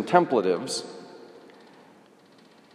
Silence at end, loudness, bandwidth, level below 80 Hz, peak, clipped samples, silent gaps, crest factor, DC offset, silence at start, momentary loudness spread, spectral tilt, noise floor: 1.35 s; -25 LUFS; 14.5 kHz; -82 dBFS; -4 dBFS; under 0.1%; none; 24 dB; under 0.1%; 0 s; 26 LU; -4.5 dB/octave; -55 dBFS